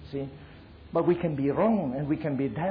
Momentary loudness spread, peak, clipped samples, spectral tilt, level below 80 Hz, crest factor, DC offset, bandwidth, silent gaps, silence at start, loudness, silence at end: 12 LU; -12 dBFS; under 0.1%; -11.5 dB/octave; -54 dBFS; 16 dB; under 0.1%; 5.2 kHz; none; 0 s; -28 LUFS; 0 s